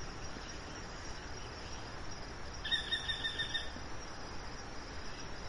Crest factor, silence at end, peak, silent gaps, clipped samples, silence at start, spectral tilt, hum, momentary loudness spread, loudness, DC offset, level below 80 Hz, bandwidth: 20 dB; 0 s; -22 dBFS; none; under 0.1%; 0 s; -2.5 dB/octave; none; 11 LU; -41 LUFS; under 0.1%; -50 dBFS; 11.5 kHz